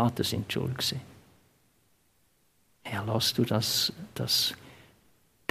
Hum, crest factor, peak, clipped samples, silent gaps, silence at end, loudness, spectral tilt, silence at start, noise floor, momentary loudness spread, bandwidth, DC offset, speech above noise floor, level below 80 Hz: none; 22 dB; -10 dBFS; under 0.1%; none; 0.75 s; -28 LUFS; -4 dB/octave; 0 s; -68 dBFS; 14 LU; 15.5 kHz; under 0.1%; 39 dB; -64 dBFS